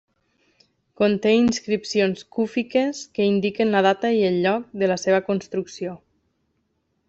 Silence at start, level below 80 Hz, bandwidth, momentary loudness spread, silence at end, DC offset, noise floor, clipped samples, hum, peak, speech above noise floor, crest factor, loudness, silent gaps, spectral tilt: 1 s; -60 dBFS; 8 kHz; 8 LU; 1.15 s; under 0.1%; -71 dBFS; under 0.1%; none; -6 dBFS; 50 dB; 16 dB; -22 LUFS; none; -5.5 dB/octave